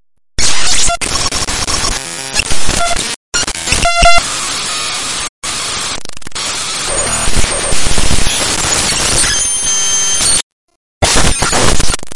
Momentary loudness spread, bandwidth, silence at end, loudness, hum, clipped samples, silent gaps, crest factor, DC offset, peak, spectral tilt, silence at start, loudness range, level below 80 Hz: 8 LU; 11.5 kHz; 0 s; -12 LUFS; none; under 0.1%; 3.16-3.32 s, 5.29-5.42 s, 10.43-10.68 s, 10.76-11.01 s; 12 dB; under 0.1%; 0 dBFS; -1.5 dB/octave; 0 s; 4 LU; -22 dBFS